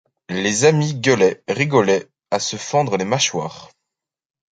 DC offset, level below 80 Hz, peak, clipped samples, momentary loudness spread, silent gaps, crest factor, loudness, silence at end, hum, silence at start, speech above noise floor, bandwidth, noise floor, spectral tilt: under 0.1%; -58 dBFS; -2 dBFS; under 0.1%; 9 LU; none; 18 dB; -18 LUFS; 0.9 s; none; 0.3 s; 66 dB; 9.4 kHz; -84 dBFS; -4 dB/octave